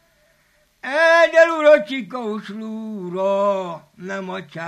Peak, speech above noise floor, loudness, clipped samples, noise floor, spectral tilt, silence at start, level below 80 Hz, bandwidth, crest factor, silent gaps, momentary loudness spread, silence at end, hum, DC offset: 0 dBFS; 36 dB; -17 LUFS; under 0.1%; -60 dBFS; -4.5 dB/octave; 0.85 s; -70 dBFS; 10.5 kHz; 18 dB; none; 18 LU; 0 s; none; under 0.1%